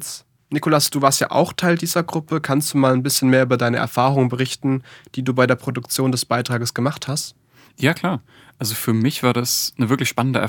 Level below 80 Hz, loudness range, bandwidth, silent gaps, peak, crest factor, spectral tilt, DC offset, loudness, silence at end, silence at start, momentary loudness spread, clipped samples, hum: -64 dBFS; 4 LU; 19.5 kHz; none; 0 dBFS; 20 dB; -4.5 dB/octave; under 0.1%; -19 LUFS; 0 s; 0 s; 9 LU; under 0.1%; none